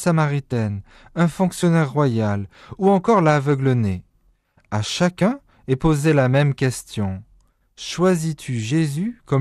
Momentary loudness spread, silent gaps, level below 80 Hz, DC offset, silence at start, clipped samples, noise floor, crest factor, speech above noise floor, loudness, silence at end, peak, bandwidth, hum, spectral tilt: 12 LU; none; -46 dBFS; under 0.1%; 0 s; under 0.1%; -61 dBFS; 14 dB; 42 dB; -20 LUFS; 0 s; -6 dBFS; 13 kHz; none; -6.5 dB/octave